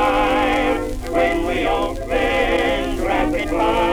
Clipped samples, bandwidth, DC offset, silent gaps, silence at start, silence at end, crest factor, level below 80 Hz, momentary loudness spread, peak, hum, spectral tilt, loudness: under 0.1%; over 20 kHz; under 0.1%; none; 0 s; 0 s; 12 dB; -30 dBFS; 5 LU; -6 dBFS; none; -5 dB/octave; -19 LUFS